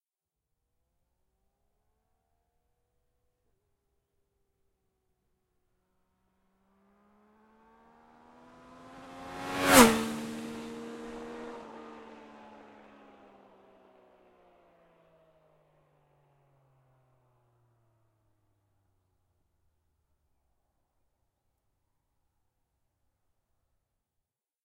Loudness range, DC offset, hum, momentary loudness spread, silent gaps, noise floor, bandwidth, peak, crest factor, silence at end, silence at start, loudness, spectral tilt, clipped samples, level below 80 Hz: 22 LU; under 0.1%; none; 32 LU; none; under -90 dBFS; 16 kHz; -4 dBFS; 34 dB; 12.45 s; 8.9 s; -26 LUFS; -3 dB/octave; under 0.1%; -64 dBFS